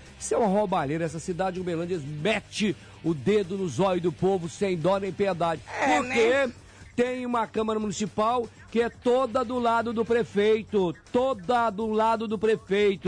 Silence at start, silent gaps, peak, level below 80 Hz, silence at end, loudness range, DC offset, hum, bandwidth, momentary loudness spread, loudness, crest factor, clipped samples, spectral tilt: 0 s; none; -14 dBFS; -56 dBFS; 0 s; 2 LU; under 0.1%; none; 10.5 kHz; 6 LU; -26 LUFS; 12 dB; under 0.1%; -5.5 dB/octave